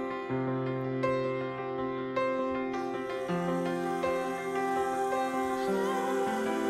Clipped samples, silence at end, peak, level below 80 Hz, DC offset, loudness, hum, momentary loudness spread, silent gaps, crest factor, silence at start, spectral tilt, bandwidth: under 0.1%; 0 s; -16 dBFS; -64 dBFS; under 0.1%; -32 LUFS; none; 4 LU; none; 14 dB; 0 s; -6 dB/octave; 14 kHz